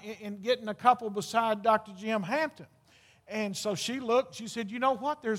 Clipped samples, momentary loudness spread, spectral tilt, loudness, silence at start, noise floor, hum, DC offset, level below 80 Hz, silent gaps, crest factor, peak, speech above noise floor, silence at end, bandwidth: under 0.1%; 10 LU; -4 dB/octave; -30 LUFS; 0 s; -62 dBFS; none; under 0.1%; -78 dBFS; none; 22 dB; -8 dBFS; 32 dB; 0 s; 16.5 kHz